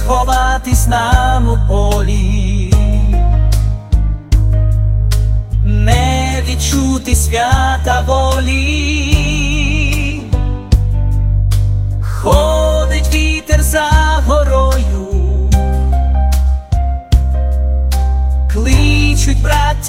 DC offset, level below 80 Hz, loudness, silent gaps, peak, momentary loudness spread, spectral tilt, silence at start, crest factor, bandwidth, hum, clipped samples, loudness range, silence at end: under 0.1%; -14 dBFS; -13 LUFS; none; 0 dBFS; 4 LU; -5 dB/octave; 0 s; 12 dB; 16 kHz; none; 0.3%; 2 LU; 0 s